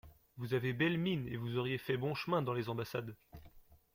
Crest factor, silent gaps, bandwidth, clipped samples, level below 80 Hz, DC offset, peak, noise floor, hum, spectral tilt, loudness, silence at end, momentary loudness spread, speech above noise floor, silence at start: 16 dB; none; 16.5 kHz; under 0.1%; -66 dBFS; under 0.1%; -22 dBFS; -61 dBFS; none; -7 dB/octave; -37 LUFS; 0.2 s; 10 LU; 24 dB; 0.05 s